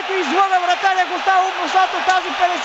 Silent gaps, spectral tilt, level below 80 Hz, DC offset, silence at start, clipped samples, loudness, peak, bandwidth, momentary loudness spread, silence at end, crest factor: none; -0.5 dB/octave; -60 dBFS; under 0.1%; 0 s; under 0.1%; -17 LUFS; -4 dBFS; 8.2 kHz; 2 LU; 0 s; 14 dB